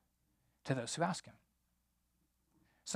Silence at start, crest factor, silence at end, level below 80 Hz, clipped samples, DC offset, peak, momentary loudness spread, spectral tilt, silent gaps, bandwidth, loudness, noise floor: 0.65 s; 24 dB; 0 s; -80 dBFS; under 0.1%; under 0.1%; -20 dBFS; 16 LU; -4 dB/octave; none; 15 kHz; -39 LUFS; -80 dBFS